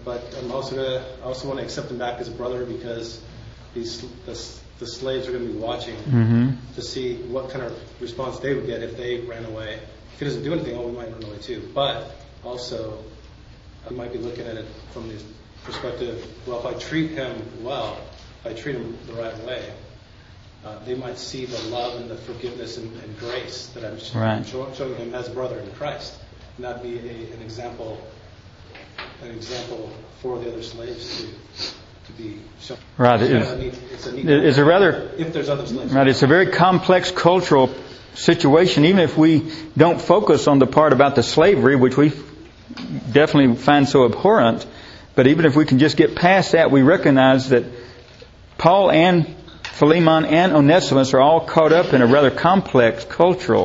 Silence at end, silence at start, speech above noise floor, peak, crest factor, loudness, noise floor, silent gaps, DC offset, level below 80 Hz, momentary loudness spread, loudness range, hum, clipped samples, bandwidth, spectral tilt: 0 s; 0 s; 27 dB; 0 dBFS; 20 dB; -17 LUFS; -45 dBFS; none; under 0.1%; -48 dBFS; 21 LU; 18 LU; none; under 0.1%; 8 kHz; -6.5 dB/octave